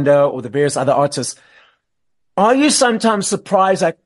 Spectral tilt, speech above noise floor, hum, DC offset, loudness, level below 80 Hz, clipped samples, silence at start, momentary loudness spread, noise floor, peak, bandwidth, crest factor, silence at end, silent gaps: -4 dB/octave; 59 dB; none; under 0.1%; -15 LUFS; -62 dBFS; under 0.1%; 0 s; 7 LU; -74 dBFS; -2 dBFS; 11.5 kHz; 14 dB; 0.15 s; none